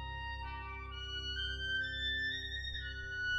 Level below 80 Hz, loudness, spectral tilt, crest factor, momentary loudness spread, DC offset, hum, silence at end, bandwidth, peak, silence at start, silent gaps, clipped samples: -48 dBFS; -39 LUFS; -3 dB/octave; 12 dB; 9 LU; under 0.1%; none; 0 s; 8.2 kHz; -28 dBFS; 0 s; none; under 0.1%